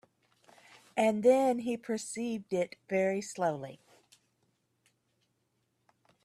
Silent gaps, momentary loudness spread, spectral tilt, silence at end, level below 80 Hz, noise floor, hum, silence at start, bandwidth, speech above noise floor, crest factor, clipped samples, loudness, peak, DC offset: none; 11 LU; -5 dB/octave; 2.5 s; -78 dBFS; -78 dBFS; none; 0.95 s; 13 kHz; 47 dB; 20 dB; under 0.1%; -31 LUFS; -14 dBFS; under 0.1%